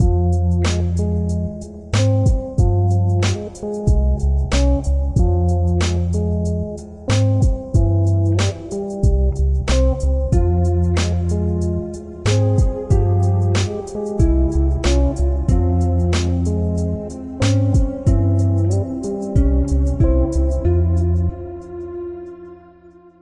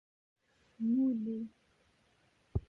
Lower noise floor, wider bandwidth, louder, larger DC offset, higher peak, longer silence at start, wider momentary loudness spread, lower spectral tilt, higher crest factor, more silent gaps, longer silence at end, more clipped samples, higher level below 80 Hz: second, -45 dBFS vs -72 dBFS; first, 11 kHz vs 4.1 kHz; first, -18 LUFS vs -35 LUFS; neither; first, -4 dBFS vs -20 dBFS; second, 0 s vs 0.8 s; about the same, 9 LU vs 11 LU; second, -7 dB/octave vs -11 dB/octave; second, 12 dB vs 18 dB; neither; first, 0.65 s vs 0.1 s; neither; first, -22 dBFS vs -54 dBFS